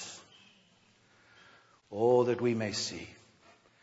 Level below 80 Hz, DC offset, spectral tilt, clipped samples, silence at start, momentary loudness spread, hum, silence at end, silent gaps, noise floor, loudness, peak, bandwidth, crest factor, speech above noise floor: -74 dBFS; under 0.1%; -5 dB/octave; under 0.1%; 0 s; 21 LU; none; 0.7 s; none; -66 dBFS; -30 LUFS; -14 dBFS; 8 kHz; 20 dB; 36 dB